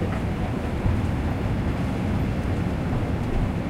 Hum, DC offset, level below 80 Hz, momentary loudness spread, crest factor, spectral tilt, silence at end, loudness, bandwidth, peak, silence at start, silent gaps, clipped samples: none; under 0.1%; -30 dBFS; 2 LU; 14 dB; -8 dB/octave; 0 s; -26 LUFS; 15 kHz; -10 dBFS; 0 s; none; under 0.1%